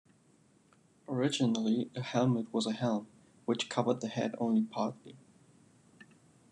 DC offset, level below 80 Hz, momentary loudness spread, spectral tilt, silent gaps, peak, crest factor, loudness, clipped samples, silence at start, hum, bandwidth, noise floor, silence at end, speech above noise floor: under 0.1%; -78 dBFS; 7 LU; -5.5 dB/octave; none; -14 dBFS; 20 dB; -33 LUFS; under 0.1%; 1.1 s; none; 10.5 kHz; -66 dBFS; 0.5 s; 34 dB